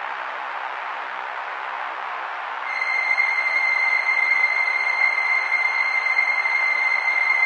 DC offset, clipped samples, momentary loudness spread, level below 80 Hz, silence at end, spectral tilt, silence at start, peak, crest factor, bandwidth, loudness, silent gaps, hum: under 0.1%; under 0.1%; 11 LU; under -90 dBFS; 0 s; 1 dB/octave; 0 s; -8 dBFS; 14 dB; 9 kHz; -20 LUFS; none; none